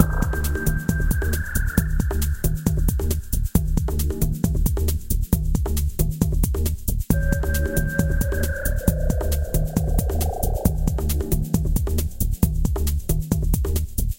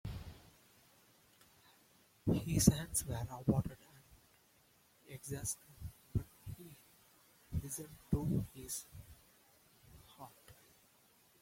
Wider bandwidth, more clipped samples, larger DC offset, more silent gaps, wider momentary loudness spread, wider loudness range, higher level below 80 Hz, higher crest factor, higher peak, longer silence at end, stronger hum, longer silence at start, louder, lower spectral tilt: about the same, 17 kHz vs 16.5 kHz; neither; neither; neither; second, 2 LU vs 26 LU; second, 1 LU vs 10 LU; first, -24 dBFS vs -56 dBFS; second, 20 dB vs 30 dB; first, 0 dBFS vs -12 dBFS; second, 0 s vs 0.9 s; neither; about the same, 0 s vs 0.05 s; first, -23 LUFS vs -38 LUFS; about the same, -6 dB/octave vs -5.5 dB/octave